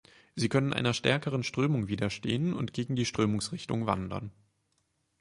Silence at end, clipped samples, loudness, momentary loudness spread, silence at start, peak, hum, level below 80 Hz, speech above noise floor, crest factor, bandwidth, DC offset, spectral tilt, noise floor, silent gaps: 0.9 s; under 0.1%; -30 LUFS; 6 LU; 0.35 s; -10 dBFS; none; -58 dBFS; 46 dB; 20 dB; 11.5 kHz; under 0.1%; -5.5 dB/octave; -76 dBFS; none